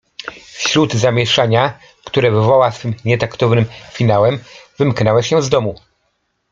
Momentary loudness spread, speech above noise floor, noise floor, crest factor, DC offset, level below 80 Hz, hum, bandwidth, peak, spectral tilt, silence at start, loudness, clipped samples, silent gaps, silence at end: 10 LU; 52 dB; -66 dBFS; 14 dB; under 0.1%; -50 dBFS; none; 7.6 kHz; 0 dBFS; -5.5 dB/octave; 0.25 s; -15 LUFS; under 0.1%; none; 0.75 s